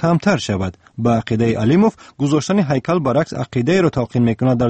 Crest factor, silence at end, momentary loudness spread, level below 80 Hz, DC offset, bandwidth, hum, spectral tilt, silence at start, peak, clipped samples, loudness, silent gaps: 14 dB; 0 s; 7 LU; -46 dBFS; under 0.1%; 8.6 kHz; none; -7 dB/octave; 0 s; -4 dBFS; under 0.1%; -17 LUFS; none